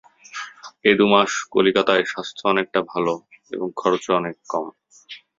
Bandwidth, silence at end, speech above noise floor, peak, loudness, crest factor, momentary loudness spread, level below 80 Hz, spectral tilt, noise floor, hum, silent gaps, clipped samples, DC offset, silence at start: 7.8 kHz; 0.2 s; 24 dB; -2 dBFS; -20 LUFS; 20 dB; 18 LU; -64 dBFS; -4 dB/octave; -44 dBFS; none; none; under 0.1%; under 0.1%; 0.35 s